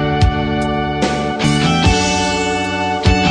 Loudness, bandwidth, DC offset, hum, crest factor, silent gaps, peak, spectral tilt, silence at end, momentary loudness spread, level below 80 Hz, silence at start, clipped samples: -15 LUFS; 10.5 kHz; under 0.1%; none; 14 dB; none; 0 dBFS; -5 dB/octave; 0 s; 5 LU; -26 dBFS; 0 s; under 0.1%